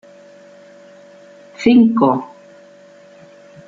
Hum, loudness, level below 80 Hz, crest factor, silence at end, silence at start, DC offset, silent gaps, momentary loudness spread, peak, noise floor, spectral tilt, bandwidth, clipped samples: none; -14 LUFS; -58 dBFS; 18 dB; 1.4 s; 1.6 s; under 0.1%; none; 13 LU; -2 dBFS; -44 dBFS; -7 dB/octave; 7.4 kHz; under 0.1%